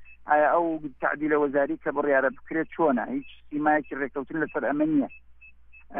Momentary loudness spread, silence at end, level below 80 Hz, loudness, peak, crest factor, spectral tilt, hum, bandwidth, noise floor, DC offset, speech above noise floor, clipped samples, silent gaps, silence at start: 9 LU; 0 s; -60 dBFS; -26 LUFS; -10 dBFS; 16 dB; -5.5 dB/octave; none; 3.7 kHz; -49 dBFS; under 0.1%; 24 dB; under 0.1%; none; 0 s